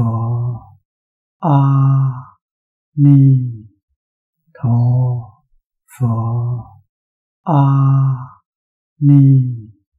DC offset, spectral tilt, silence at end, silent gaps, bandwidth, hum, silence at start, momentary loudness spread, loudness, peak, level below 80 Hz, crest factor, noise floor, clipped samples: under 0.1%; -11.5 dB/octave; 0.3 s; 0.85-1.40 s, 2.42-2.92 s, 3.83-3.88 s, 3.96-4.33 s, 5.66-5.70 s, 6.89-7.44 s, 8.46-8.96 s; 3 kHz; none; 0 s; 17 LU; -14 LUFS; -2 dBFS; -54 dBFS; 14 dB; -59 dBFS; under 0.1%